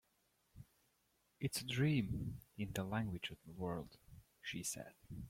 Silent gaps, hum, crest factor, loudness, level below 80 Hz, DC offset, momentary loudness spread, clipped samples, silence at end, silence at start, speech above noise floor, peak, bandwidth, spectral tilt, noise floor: none; none; 20 dB; -43 LUFS; -64 dBFS; under 0.1%; 21 LU; under 0.1%; 0 s; 0.55 s; 38 dB; -24 dBFS; 16.5 kHz; -5 dB/octave; -80 dBFS